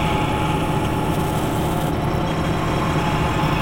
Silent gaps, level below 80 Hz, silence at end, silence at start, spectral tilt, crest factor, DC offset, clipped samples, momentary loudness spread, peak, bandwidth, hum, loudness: none; -32 dBFS; 0 s; 0 s; -6 dB/octave; 12 dB; under 0.1%; under 0.1%; 2 LU; -8 dBFS; 16.5 kHz; none; -21 LUFS